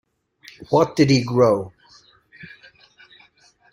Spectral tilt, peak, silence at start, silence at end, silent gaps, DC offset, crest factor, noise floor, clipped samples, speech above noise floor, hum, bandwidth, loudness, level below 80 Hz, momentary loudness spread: -6.5 dB/octave; -2 dBFS; 0.6 s; 1.25 s; none; under 0.1%; 20 dB; -56 dBFS; under 0.1%; 39 dB; none; 16 kHz; -18 LUFS; -56 dBFS; 26 LU